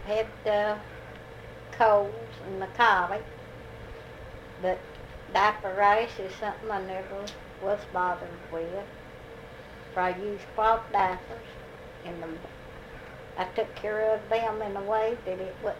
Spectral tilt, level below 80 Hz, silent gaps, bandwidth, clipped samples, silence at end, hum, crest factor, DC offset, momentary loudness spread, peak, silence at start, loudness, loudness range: -5 dB/octave; -52 dBFS; none; 15.5 kHz; under 0.1%; 0 s; none; 22 dB; under 0.1%; 21 LU; -8 dBFS; 0 s; -29 LUFS; 6 LU